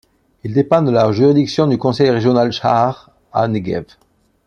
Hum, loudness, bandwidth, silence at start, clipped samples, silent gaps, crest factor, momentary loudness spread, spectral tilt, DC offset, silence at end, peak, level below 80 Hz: none; -15 LUFS; 9 kHz; 0.45 s; under 0.1%; none; 14 dB; 11 LU; -7.5 dB/octave; under 0.1%; 0.65 s; -2 dBFS; -52 dBFS